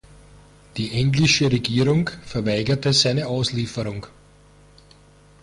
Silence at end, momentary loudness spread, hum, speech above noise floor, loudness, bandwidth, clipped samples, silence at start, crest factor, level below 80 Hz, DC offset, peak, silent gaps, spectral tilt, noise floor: 1.35 s; 13 LU; 50 Hz at -45 dBFS; 30 dB; -21 LUFS; 11.5 kHz; under 0.1%; 0.75 s; 18 dB; -46 dBFS; under 0.1%; -6 dBFS; none; -5 dB/octave; -51 dBFS